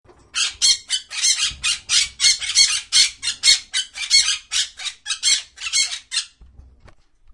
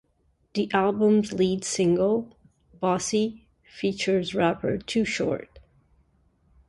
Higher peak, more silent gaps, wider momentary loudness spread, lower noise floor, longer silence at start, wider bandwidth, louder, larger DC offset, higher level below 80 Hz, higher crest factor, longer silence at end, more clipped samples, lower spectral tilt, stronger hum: first, 0 dBFS vs -6 dBFS; neither; about the same, 10 LU vs 9 LU; second, -50 dBFS vs -68 dBFS; second, 0.35 s vs 0.55 s; about the same, 11.5 kHz vs 11.5 kHz; first, -17 LUFS vs -25 LUFS; neither; first, -52 dBFS vs -58 dBFS; about the same, 20 dB vs 20 dB; second, 0.9 s vs 1.1 s; neither; second, 4 dB/octave vs -5 dB/octave; neither